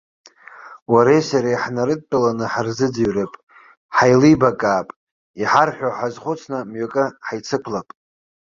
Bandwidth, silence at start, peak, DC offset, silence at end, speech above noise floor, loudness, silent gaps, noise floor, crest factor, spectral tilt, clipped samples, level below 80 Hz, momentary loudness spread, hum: 7.4 kHz; 0.55 s; -2 dBFS; under 0.1%; 0.6 s; 23 dB; -19 LUFS; 0.82-0.86 s, 3.43-3.47 s, 3.77-3.89 s, 4.96-5.34 s; -41 dBFS; 18 dB; -6 dB/octave; under 0.1%; -54 dBFS; 14 LU; none